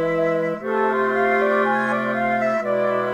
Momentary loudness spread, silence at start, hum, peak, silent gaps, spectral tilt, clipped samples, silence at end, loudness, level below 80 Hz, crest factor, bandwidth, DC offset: 3 LU; 0 s; none; -8 dBFS; none; -6.5 dB/octave; under 0.1%; 0 s; -20 LUFS; -56 dBFS; 12 dB; 13 kHz; under 0.1%